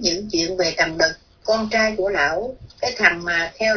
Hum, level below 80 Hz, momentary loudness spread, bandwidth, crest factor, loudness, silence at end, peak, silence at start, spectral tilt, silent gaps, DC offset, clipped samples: none; -48 dBFS; 9 LU; 5.4 kHz; 20 dB; -19 LUFS; 0 s; 0 dBFS; 0 s; -2.5 dB/octave; none; under 0.1%; under 0.1%